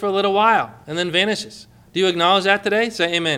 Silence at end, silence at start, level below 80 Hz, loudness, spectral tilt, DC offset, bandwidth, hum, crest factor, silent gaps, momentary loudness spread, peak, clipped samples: 0 s; 0 s; -60 dBFS; -18 LUFS; -3.5 dB/octave; under 0.1%; 14.5 kHz; none; 18 dB; none; 11 LU; -2 dBFS; under 0.1%